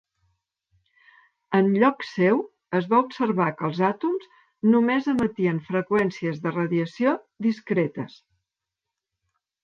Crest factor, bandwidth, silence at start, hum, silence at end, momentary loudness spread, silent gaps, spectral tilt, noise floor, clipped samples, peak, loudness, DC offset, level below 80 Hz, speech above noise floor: 18 dB; 7 kHz; 1.5 s; none; 1.55 s; 8 LU; none; -8 dB/octave; -86 dBFS; under 0.1%; -6 dBFS; -24 LUFS; under 0.1%; -66 dBFS; 63 dB